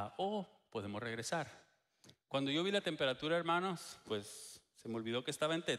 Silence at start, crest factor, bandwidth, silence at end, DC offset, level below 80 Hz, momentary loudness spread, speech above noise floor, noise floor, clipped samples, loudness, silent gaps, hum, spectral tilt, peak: 0 s; 18 dB; 15.5 kHz; 0 s; under 0.1%; -78 dBFS; 13 LU; 28 dB; -67 dBFS; under 0.1%; -39 LUFS; none; none; -4 dB/octave; -22 dBFS